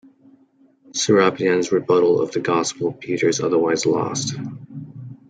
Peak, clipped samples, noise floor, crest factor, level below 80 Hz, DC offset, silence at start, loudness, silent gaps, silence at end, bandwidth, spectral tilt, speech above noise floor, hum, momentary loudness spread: -2 dBFS; under 0.1%; -56 dBFS; 18 dB; -64 dBFS; under 0.1%; 0.95 s; -19 LUFS; none; 0.15 s; 9.4 kHz; -4.5 dB/octave; 37 dB; none; 16 LU